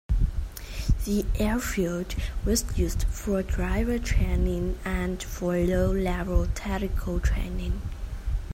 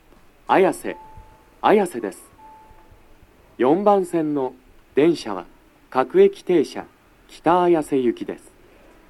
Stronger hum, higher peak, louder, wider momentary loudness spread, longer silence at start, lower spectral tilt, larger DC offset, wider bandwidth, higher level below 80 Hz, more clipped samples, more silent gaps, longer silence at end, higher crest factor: neither; second, -10 dBFS vs -2 dBFS; second, -28 LUFS vs -20 LUFS; second, 7 LU vs 16 LU; second, 0.1 s vs 0.5 s; about the same, -6 dB/octave vs -6 dB/octave; neither; first, 16 kHz vs 12.5 kHz; first, -28 dBFS vs -54 dBFS; neither; neither; second, 0 s vs 0.75 s; about the same, 16 dB vs 20 dB